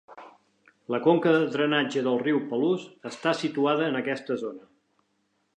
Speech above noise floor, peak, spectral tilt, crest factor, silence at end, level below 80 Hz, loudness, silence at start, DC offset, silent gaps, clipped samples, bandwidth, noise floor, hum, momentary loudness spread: 47 dB; -8 dBFS; -6 dB/octave; 18 dB; 0.95 s; -82 dBFS; -26 LUFS; 0.1 s; under 0.1%; none; under 0.1%; 9.6 kHz; -73 dBFS; none; 10 LU